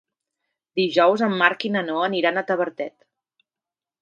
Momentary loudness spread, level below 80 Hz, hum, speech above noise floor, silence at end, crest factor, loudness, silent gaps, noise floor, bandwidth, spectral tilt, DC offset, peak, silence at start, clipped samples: 11 LU; -76 dBFS; none; over 69 dB; 1.15 s; 24 dB; -21 LUFS; none; under -90 dBFS; 7.6 kHz; -6 dB/octave; under 0.1%; 0 dBFS; 0.75 s; under 0.1%